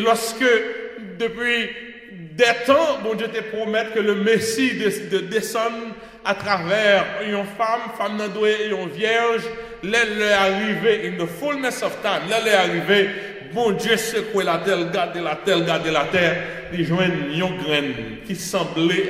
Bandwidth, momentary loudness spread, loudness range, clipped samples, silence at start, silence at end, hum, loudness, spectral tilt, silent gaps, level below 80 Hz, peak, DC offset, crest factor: 16 kHz; 10 LU; 2 LU; under 0.1%; 0 s; 0 s; none; -21 LUFS; -4 dB/octave; none; -54 dBFS; -2 dBFS; under 0.1%; 18 dB